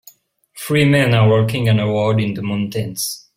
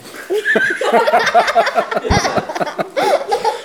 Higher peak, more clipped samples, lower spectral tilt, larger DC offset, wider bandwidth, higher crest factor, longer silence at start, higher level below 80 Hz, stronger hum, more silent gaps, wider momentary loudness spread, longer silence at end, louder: about the same, -2 dBFS vs 0 dBFS; neither; first, -6 dB/octave vs -4 dB/octave; second, under 0.1% vs 0.1%; second, 16.5 kHz vs over 20 kHz; about the same, 16 dB vs 16 dB; first, 0.55 s vs 0.05 s; second, -50 dBFS vs -36 dBFS; neither; neither; about the same, 9 LU vs 8 LU; first, 0.2 s vs 0 s; about the same, -16 LUFS vs -15 LUFS